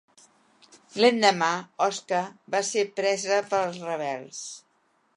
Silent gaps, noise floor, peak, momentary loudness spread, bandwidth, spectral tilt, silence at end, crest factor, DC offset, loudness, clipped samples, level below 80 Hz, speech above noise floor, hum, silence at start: none; -68 dBFS; -6 dBFS; 16 LU; 11.5 kHz; -3 dB/octave; 0.6 s; 22 dB; under 0.1%; -25 LUFS; under 0.1%; -82 dBFS; 43 dB; none; 0.95 s